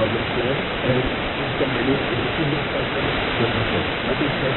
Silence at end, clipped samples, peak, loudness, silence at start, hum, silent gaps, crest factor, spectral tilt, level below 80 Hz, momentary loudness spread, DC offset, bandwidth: 0 s; under 0.1%; -6 dBFS; -22 LUFS; 0 s; none; none; 16 dB; -3.5 dB/octave; -38 dBFS; 2 LU; under 0.1%; 4.3 kHz